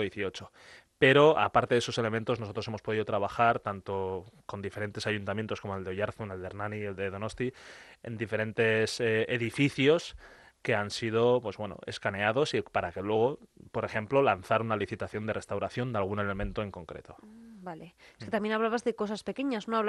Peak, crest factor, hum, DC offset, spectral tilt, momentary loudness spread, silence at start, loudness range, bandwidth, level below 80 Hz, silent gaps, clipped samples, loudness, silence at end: -8 dBFS; 24 dB; none; under 0.1%; -5.5 dB/octave; 14 LU; 0 s; 8 LU; 12 kHz; -58 dBFS; none; under 0.1%; -30 LUFS; 0 s